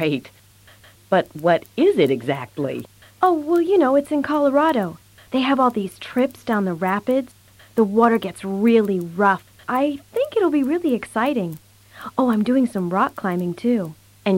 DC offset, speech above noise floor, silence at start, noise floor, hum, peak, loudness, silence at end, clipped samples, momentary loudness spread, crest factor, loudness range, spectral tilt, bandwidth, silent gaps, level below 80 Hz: under 0.1%; 30 dB; 0 s; -49 dBFS; none; -4 dBFS; -20 LUFS; 0 s; under 0.1%; 10 LU; 16 dB; 3 LU; -7 dB/octave; 16.5 kHz; none; -60 dBFS